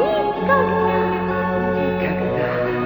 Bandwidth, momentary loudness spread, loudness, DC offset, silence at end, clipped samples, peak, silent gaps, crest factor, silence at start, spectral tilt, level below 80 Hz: over 20 kHz; 4 LU; -19 LUFS; under 0.1%; 0 s; under 0.1%; -4 dBFS; none; 14 dB; 0 s; -9 dB/octave; -44 dBFS